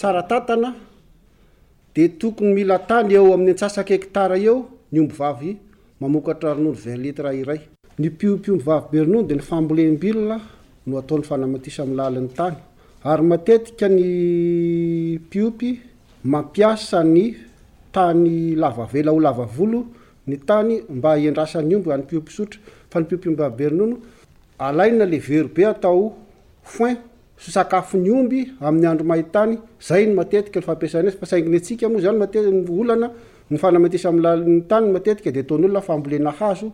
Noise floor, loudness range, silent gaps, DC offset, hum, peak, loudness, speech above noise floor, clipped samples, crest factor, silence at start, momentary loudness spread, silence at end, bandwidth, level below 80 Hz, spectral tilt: -53 dBFS; 4 LU; none; under 0.1%; none; -4 dBFS; -19 LUFS; 35 dB; under 0.1%; 14 dB; 0 s; 11 LU; 0 s; 11.5 kHz; -52 dBFS; -7.5 dB/octave